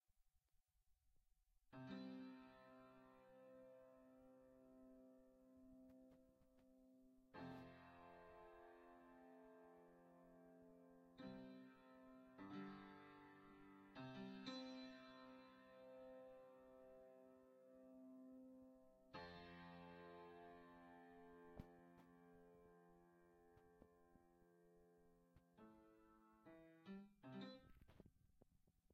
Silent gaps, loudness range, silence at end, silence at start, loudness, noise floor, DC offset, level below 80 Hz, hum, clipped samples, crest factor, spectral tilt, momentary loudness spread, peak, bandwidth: none; 9 LU; 0 s; 0.1 s; -63 LUFS; -85 dBFS; under 0.1%; -84 dBFS; none; under 0.1%; 24 dB; -4.5 dB/octave; 12 LU; -40 dBFS; 6.4 kHz